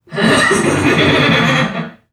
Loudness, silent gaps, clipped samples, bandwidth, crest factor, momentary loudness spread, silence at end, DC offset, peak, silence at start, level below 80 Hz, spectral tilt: -12 LUFS; none; under 0.1%; 14 kHz; 14 dB; 6 LU; 0.2 s; under 0.1%; 0 dBFS; 0.1 s; -42 dBFS; -4.5 dB/octave